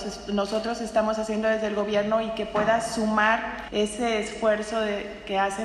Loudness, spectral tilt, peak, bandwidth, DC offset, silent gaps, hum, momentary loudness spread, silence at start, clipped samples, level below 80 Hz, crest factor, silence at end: -26 LUFS; -4 dB/octave; -8 dBFS; 12 kHz; under 0.1%; none; none; 6 LU; 0 s; under 0.1%; -50 dBFS; 18 dB; 0 s